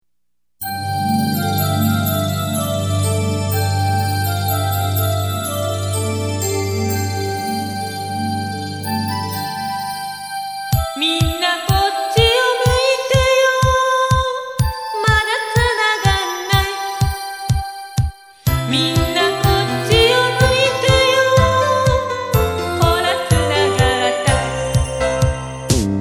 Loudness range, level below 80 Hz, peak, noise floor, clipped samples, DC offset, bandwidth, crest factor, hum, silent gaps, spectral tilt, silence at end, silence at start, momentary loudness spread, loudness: 7 LU; -30 dBFS; 0 dBFS; -80 dBFS; under 0.1%; under 0.1%; over 20 kHz; 18 dB; none; none; -4.5 dB/octave; 0 s; 0.6 s; 9 LU; -17 LUFS